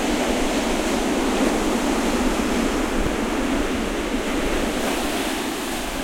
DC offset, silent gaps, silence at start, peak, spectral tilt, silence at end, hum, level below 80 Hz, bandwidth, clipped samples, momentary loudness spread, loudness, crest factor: under 0.1%; none; 0 s; -8 dBFS; -3.5 dB/octave; 0 s; none; -32 dBFS; 16.5 kHz; under 0.1%; 4 LU; -22 LUFS; 14 dB